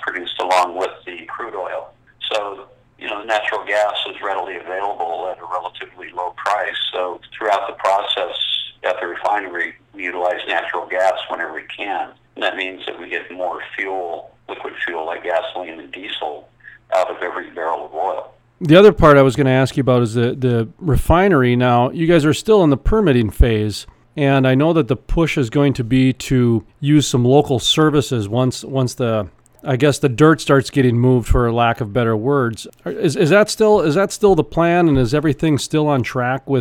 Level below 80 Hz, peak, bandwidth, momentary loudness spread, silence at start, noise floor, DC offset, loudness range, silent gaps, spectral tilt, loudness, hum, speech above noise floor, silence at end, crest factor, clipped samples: -32 dBFS; 0 dBFS; 16.5 kHz; 14 LU; 0 s; -44 dBFS; under 0.1%; 10 LU; none; -6 dB/octave; -17 LUFS; none; 28 dB; 0 s; 16 dB; under 0.1%